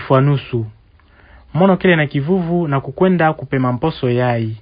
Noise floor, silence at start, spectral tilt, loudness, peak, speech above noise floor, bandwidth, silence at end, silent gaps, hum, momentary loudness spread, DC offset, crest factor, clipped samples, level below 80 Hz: -48 dBFS; 0 s; -11.5 dB/octave; -16 LUFS; 0 dBFS; 33 dB; 5.2 kHz; 0 s; none; none; 8 LU; under 0.1%; 16 dB; under 0.1%; -46 dBFS